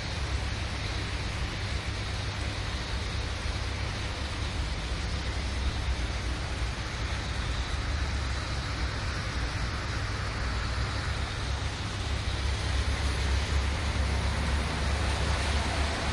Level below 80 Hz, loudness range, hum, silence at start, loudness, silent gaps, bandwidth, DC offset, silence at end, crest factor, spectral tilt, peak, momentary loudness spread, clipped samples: -34 dBFS; 3 LU; none; 0 s; -32 LUFS; none; 11.5 kHz; under 0.1%; 0 s; 14 dB; -4.5 dB/octave; -16 dBFS; 4 LU; under 0.1%